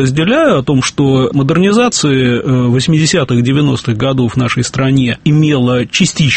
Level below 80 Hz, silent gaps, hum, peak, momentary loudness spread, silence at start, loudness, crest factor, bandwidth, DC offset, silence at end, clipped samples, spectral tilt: -40 dBFS; none; none; 0 dBFS; 3 LU; 0 s; -11 LUFS; 10 dB; 8.8 kHz; under 0.1%; 0 s; under 0.1%; -5.5 dB/octave